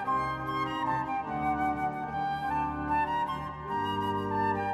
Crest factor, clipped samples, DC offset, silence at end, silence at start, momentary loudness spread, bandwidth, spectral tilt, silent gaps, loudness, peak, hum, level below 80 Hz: 12 dB; under 0.1%; under 0.1%; 0 s; 0 s; 4 LU; 13.5 kHz; -6.5 dB/octave; none; -31 LUFS; -18 dBFS; none; -52 dBFS